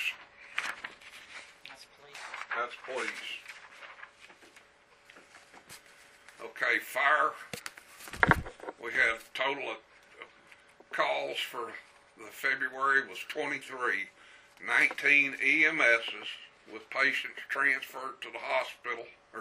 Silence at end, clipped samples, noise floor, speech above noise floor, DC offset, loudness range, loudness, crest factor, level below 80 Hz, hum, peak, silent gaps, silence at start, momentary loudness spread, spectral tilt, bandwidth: 0 s; under 0.1%; -61 dBFS; 30 dB; under 0.1%; 13 LU; -30 LUFS; 30 dB; -60 dBFS; none; -4 dBFS; none; 0 s; 24 LU; -3 dB/octave; 15.5 kHz